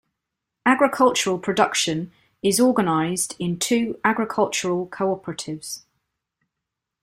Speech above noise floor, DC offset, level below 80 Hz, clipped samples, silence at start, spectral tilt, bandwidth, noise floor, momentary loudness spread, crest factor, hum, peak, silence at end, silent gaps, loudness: 62 dB; under 0.1%; -62 dBFS; under 0.1%; 0.65 s; -3.5 dB/octave; 16 kHz; -83 dBFS; 13 LU; 20 dB; none; -2 dBFS; 1.25 s; none; -21 LUFS